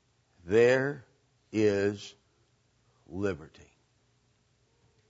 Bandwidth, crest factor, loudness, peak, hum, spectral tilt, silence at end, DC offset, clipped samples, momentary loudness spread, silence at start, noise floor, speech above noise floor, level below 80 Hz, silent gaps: 8 kHz; 20 dB; -28 LUFS; -12 dBFS; none; -6 dB/octave; 1.65 s; under 0.1%; under 0.1%; 21 LU; 0.45 s; -70 dBFS; 42 dB; -66 dBFS; none